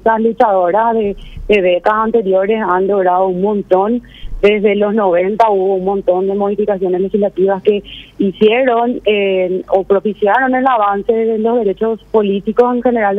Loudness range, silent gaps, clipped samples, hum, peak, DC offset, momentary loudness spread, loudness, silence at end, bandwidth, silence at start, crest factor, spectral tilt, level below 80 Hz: 1 LU; none; under 0.1%; none; 0 dBFS; under 0.1%; 4 LU; -13 LUFS; 0 s; 5.4 kHz; 0.05 s; 12 dB; -8 dB/octave; -38 dBFS